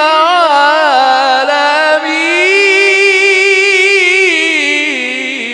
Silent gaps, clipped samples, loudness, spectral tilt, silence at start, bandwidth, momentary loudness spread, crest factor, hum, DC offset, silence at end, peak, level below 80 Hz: none; 0.3%; -8 LUFS; 0.5 dB/octave; 0 s; 11 kHz; 4 LU; 10 dB; none; under 0.1%; 0 s; 0 dBFS; -64 dBFS